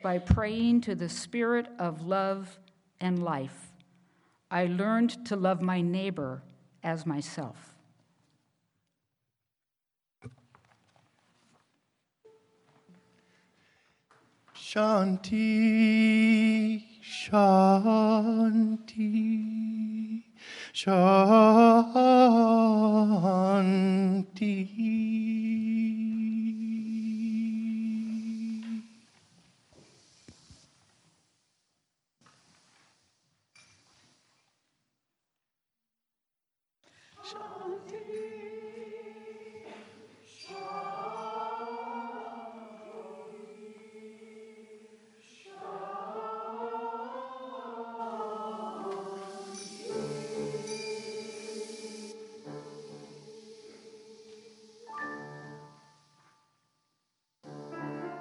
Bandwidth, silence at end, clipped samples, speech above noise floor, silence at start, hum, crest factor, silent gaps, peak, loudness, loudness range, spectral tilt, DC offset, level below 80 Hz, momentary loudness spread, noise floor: 11.5 kHz; 0 s; under 0.1%; 64 dB; 0 s; none; 24 dB; none; -6 dBFS; -27 LUFS; 24 LU; -7 dB/octave; under 0.1%; -58 dBFS; 24 LU; -89 dBFS